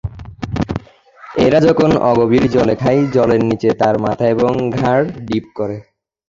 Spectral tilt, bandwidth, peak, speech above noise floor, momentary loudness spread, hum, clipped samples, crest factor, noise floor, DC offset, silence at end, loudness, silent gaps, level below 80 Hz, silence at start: -7.5 dB/octave; 7.6 kHz; -2 dBFS; 28 dB; 13 LU; none; under 0.1%; 14 dB; -42 dBFS; under 0.1%; 0.45 s; -15 LUFS; none; -38 dBFS; 0.05 s